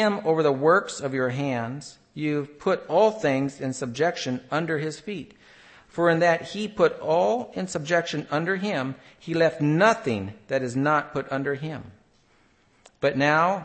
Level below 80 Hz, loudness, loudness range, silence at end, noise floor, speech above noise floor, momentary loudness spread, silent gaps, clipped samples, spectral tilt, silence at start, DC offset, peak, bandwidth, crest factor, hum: -64 dBFS; -24 LUFS; 2 LU; 0 s; -61 dBFS; 37 dB; 11 LU; none; under 0.1%; -5.5 dB/octave; 0 s; under 0.1%; -6 dBFS; 8.8 kHz; 18 dB; none